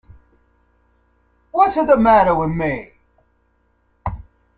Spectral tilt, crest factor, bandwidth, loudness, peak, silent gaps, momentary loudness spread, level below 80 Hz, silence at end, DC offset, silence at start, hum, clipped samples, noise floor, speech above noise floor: -9.5 dB/octave; 18 dB; 4.7 kHz; -16 LUFS; -2 dBFS; none; 18 LU; -42 dBFS; 0.4 s; under 0.1%; 1.55 s; none; under 0.1%; -62 dBFS; 47 dB